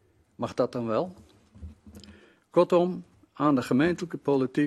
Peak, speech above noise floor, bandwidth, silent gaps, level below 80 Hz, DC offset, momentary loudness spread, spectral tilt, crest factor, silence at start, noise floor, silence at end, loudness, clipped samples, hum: -8 dBFS; 29 dB; 13 kHz; none; -60 dBFS; under 0.1%; 21 LU; -7 dB/octave; 18 dB; 0.4 s; -54 dBFS; 0 s; -27 LUFS; under 0.1%; none